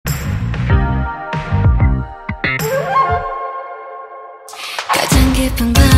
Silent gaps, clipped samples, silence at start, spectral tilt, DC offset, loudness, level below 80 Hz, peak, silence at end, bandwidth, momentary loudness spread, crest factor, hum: none; under 0.1%; 0.05 s; -5 dB/octave; under 0.1%; -16 LUFS; -20 dBFS; 0 dBFS; 0 s; 16.5 kHz; 17 LU; 16 dB; none